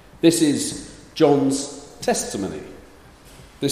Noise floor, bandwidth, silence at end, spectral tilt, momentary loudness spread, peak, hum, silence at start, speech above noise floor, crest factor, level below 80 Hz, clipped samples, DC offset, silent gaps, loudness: -46 dBFS; 15.5 kHz; 0 s; -4.5 dB/octave; 18 LU; -2 dBFS; none; 0.25 s; 27 dB; 20 dB; -52 dBFS; under 0.1%; under 0.1%; none; -21 LUFS